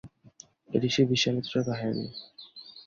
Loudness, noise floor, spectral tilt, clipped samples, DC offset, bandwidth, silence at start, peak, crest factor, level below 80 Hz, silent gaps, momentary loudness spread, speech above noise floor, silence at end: -28 LUFS; -55 dBFS; -5 dB/octave; under 0.1%; under 0.1%; 7.6 kHz; 0.05 s; -10 dBFS; 20 dB; -64 dBFS; none; 21 LU; 28 dB; 0.05 s